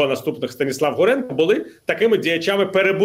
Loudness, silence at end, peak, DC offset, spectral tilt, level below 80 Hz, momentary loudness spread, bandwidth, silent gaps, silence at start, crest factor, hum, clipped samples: -19 LUFS; 0 s; -6 dBFS; under 0.1%; -5 dB/octave; -64 dBFS; 7 LU; 16 kHz; none; 0 s; 14 dB; none; under 0.1%